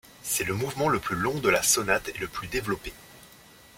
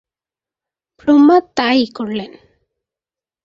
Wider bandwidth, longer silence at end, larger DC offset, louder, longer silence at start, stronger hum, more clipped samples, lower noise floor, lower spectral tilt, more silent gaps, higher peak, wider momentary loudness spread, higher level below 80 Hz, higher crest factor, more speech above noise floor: first, 16.5 kHz vs 7.6 kHz; second, 0.4 s vs 1.2 s; neither; second, -26 LUFS vs -14 LUFS; second, 0.2 s vs 1.05 s; neither; neither; second, -52 dBFS vs under -90 dBFS; second, -3 dB/octave vs -5.5 dB/octave; neither; second, -6 dBFS vs -2 dBFS; second, 12 LU vs 15 LU; first, -50 dBFS vs -58 dBFS; first, 22 dB vs 16 dB; second, 25 dB vs over 77 dB